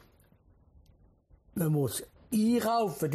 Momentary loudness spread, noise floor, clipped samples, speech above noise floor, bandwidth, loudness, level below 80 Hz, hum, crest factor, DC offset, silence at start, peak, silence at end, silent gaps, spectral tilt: 9 LU; -63 dBFS; under 0.1%; 34 dB; 15 kHz; -30 LUFS; -62 dBFS; none; 14 dB; under 0.1%; 1.55 s; -18 dBFS; 0 s; none; -6 dB/octave